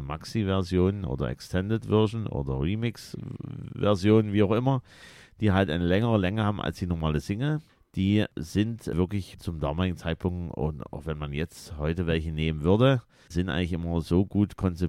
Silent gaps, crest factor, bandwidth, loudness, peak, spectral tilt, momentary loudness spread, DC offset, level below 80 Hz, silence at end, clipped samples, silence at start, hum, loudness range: none; 20 dB; 13.5 kHz; -27 LUFS; -8 dBFS; -7.5 dB/octave; 10 LU; under 0.1%; -44 dBFS; 0 s; under 0.1%; 0 s; none; 5 LU